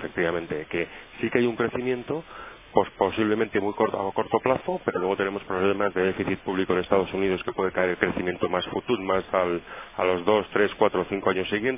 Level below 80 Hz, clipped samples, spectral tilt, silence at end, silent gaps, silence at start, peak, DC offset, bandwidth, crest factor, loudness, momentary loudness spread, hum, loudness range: -54 dBFS; under 0.1%; -9.5 dB/octave; 0 s; none; 0 s; -4 dBFS; under 0.1%; 3.8 kHz; 22 dB; -26 LUFS; 7 LU; none; 1 LU